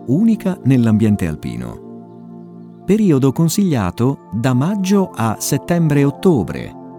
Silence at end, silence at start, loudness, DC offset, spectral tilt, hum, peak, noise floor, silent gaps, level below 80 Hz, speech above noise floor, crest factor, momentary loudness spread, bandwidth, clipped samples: 0 s; 0 s; -16 LUFS; under 0.1%; -7 dB/octave; none; 0 dBFS; -36 dBFS; none; -44 dBFS; 21 dB; 16 dB; 21 LU; 18.5 kHz; under 0.1%